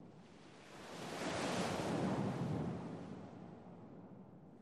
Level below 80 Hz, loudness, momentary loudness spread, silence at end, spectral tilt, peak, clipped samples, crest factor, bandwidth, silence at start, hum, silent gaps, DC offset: -70 dBFS; -42 LUFS; 19 LU; 0 s; -5.5 dB/octave; -28 dBFS; under 0.1%; 16 dB; 13 kHz; 0 s; none; none; under 0.1%